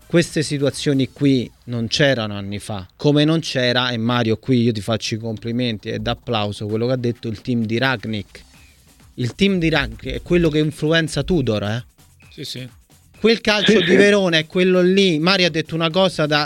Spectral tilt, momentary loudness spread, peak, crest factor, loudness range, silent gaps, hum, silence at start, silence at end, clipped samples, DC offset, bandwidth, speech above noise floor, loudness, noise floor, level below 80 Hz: -5.5 dB/octave; 13 LU; 0 dBFS; 18 dB; 7 LU; none; none; 0.1 s; 0 s; under 0.1%; under 0.1%; 17 kHz; 31 dB; -18 LUFS; -49 dBFS; -42 dBFS